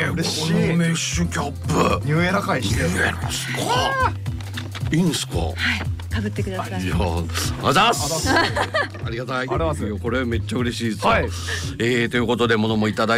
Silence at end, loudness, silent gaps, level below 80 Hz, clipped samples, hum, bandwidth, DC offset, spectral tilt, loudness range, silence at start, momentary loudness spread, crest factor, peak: 0 s; -21 LUFS; none; -36 dBFS; under 0.1%; none; 16 kHz; under 0.1%; -4.5 dB/octave; 2 LU; 0 s; 7 LU; 14 dB; -8 dBFS